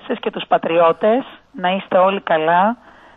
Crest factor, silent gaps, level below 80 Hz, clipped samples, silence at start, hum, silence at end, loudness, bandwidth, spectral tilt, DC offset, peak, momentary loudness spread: 14 dB; none; -62 dBFS; under 0.1%; 0.05 s; none; 0.4 s; -17 LUFS; 4.1 kHz; -8 dB/octave; under 0.1%; -2 dBFS; 9 LU